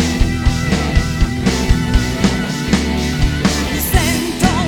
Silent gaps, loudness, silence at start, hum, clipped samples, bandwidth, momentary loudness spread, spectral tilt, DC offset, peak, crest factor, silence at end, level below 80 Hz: none; -16 LUFS; 0 s; none; under 0.1%; 18.5 kHz; 2 LU; -5 dB/octave; under 0.1%; 0 dBFS; 14 dB; 0 s; -20 dBFS